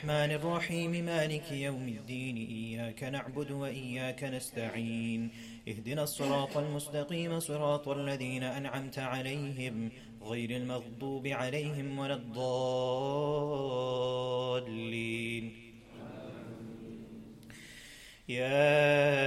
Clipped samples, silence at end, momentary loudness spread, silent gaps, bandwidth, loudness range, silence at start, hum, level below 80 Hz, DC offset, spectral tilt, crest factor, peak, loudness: under 0.1%; 0 s; 15 LU; none; 15.5 kHz; 4 LU; 0 s; none; -64 dBFS; under 0.1%; -5.5 dB/octave; 20 dB; -16 dBFS; -35 LUFS